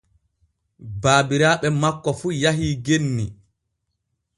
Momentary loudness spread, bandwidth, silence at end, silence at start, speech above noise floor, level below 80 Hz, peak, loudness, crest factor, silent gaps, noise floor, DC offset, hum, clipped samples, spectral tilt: 9 LU; 11.5 kHz; 1.05 s; 0.8 s; 56 dB; -48 dBFS; 0 dBFS; -20 LUFS; 22 dB; none; -76 dBFS; under 0.1%; none; under 0.1%; -5 dB/octave